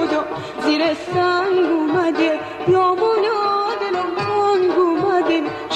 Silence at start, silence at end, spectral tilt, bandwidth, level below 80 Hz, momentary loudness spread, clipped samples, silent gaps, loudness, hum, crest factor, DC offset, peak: 0 s; 0 s; -5.5 dB/octave; 9 kHz; -56 dBFS; 5 LU; under 0.1%; none; -18 LUFS; none; 12 dB; under 0.1%; -6 dBFS